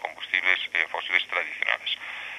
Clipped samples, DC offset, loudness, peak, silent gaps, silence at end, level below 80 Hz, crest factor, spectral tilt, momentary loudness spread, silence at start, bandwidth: under 0.1%; under 0.1%; -25 LUFS; -4 dBFS; none; 0 s; -76 dBFS; 24 dB; 0 dB/octave; 6 LU; 0 s; 14 kHz